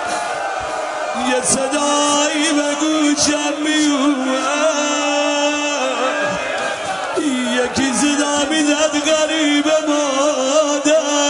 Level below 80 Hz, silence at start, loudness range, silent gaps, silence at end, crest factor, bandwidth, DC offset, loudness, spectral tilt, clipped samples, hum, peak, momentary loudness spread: -54 dBFS; 0 s; 2 LU; none; 0 s; 16 dB; 11 kHz; under 0.1%; -16 LUFS; -1.5 dB/octave; under 0.1%; none; -2 dBFS; 6 LU